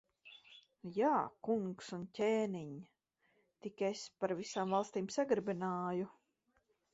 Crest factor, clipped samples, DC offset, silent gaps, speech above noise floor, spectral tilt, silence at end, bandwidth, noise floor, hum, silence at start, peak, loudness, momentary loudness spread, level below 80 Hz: 18 dB; under 0.1%; under 0.1%; none; 42 dB; -5 dB/octave; 0.85 s; 7.6 kHz; -80 dBFS; none; 0.25 s; -20 dBFS; -38 LUFS; 17 LU; -80 dBFS